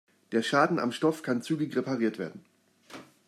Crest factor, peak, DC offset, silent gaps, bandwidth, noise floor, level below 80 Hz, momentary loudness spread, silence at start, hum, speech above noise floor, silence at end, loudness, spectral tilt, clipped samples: 20 dB; -10 dBFS; under 0.1%; none; 14 kHz; -50 dBFS; -78 dBFS; 19 LU; 0.3 s; none; 22 dB; 0.25 s; -29 LUFS; -5.5 dB/octave; under 0.1%